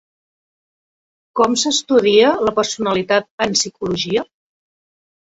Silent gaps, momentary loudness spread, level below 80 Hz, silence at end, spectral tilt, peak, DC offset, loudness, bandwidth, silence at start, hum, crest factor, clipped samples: 3.31-3.38 s; 9 LU; -56 dBFS; 1 s; -3 dB/octave; -2 dBFS; under 0.1%; -16 LUFS; 8 kHz; 1.35 s; none; 18 dB; under 0.1%